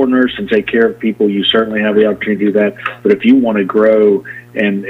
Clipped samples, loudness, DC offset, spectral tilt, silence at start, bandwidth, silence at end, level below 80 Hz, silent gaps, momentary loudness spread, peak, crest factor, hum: under 0.1%; -12 LUFS; under 0.1%; -7.5 dB/octave; 0 s; 4.8 kHz; 0 s; -52 dBFS; none; 7 LU; 0 dBFS; 12 dB; none